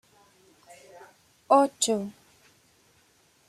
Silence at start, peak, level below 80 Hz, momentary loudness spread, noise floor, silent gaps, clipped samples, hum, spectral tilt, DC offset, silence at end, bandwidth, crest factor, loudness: 1.5 s; -8 dBFS; -78 dBFS; 20 LU; -63 dBFS; none; under 0.1%; none; -3 dB/octave; under 0.1%; 1.4 s; 14.5 kHz; 22 dB; -24 LUFS